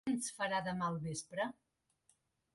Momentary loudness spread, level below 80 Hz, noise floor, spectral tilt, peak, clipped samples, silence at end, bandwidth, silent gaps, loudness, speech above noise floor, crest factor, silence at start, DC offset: 5 LU; -74 dBFS; -76 dBFS; -4.5 dB/octave; -24 dBFS; under 0.1%; 1 s; 11.5 kHz; none; -39 LUFS; 38 dB; 18 dB; 0.05 s; under 0.1%